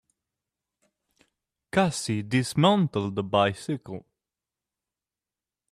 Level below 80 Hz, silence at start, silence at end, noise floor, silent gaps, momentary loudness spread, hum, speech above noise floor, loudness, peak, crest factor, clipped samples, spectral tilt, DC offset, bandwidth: -62 dBFS; 1.75 s; 1.7 s; under -90 dBFS; none; 12 LU; none; over 65 dB; -25 LUFS; -6 dBFS; 22 dB; under 0.1%; -5.5 dB/octave; under 0.1%; 14.5 kHz